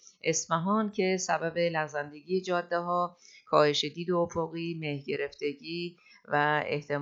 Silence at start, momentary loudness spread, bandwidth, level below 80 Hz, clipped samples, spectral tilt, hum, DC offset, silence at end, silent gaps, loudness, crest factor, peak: 0.25 s; 9 LU; 8 kHz; -72 dBFS; under 0.1%; -4 dB/octave; none; under 0.1%; 0 s; none; -30 LUFS; 22 dB; -8 dBFS